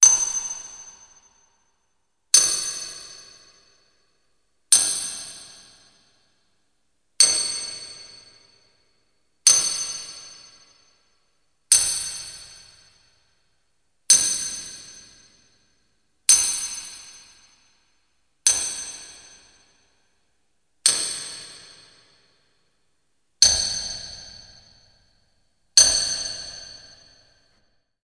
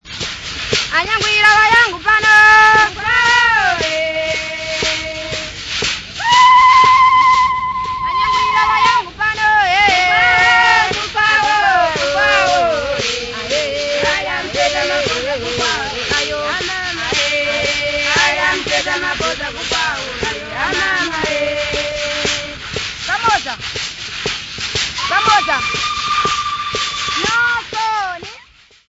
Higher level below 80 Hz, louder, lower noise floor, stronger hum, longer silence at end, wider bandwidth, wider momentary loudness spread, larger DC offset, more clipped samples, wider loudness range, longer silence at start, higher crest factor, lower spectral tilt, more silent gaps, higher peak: second, -56 dBFS vs -40 dBFS; second, -19 LUFS vs -13 LUFS; first, -74 dBFS vs -45 dBFS; neither; first, 1.25 s vs 0.55 s; about the same, 10.5 kHz vs 11 kHz; first, 24 LU vs 12 LU; neither; neither; about the same, 7 LU vs 7 LU; about the same, 0 s vs 0.05 s; first, 26 dB vs 14 dB; second, 2.5 dB/octave vs -1.5 dB/octave; neither; about the same, 0 dBFS vs 0 dBFS